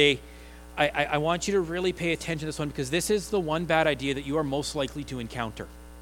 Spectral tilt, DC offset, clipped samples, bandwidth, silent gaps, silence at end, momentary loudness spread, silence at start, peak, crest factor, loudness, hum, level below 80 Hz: -4.5 dB/octave; under 0.1%; under 0.1%; 18.5 kHz; none; 0 s; 11 LU; 0 s; -6 dBFS; 22 dB; -28 LUFS; none; -46 dBFS